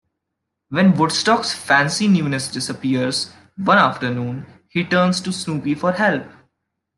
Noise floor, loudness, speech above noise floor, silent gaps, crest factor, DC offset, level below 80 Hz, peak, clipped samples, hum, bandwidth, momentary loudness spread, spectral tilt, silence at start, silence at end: -79 dBFS; -18 LUFS; 61 dB; none; 18 dB; under 0.1%; -64 dBFS; -2 dBFS; under 0.1%; none; 12.5 kHz; 11 LU; -4.5 dB/octave; 0.7 s; 0.7 s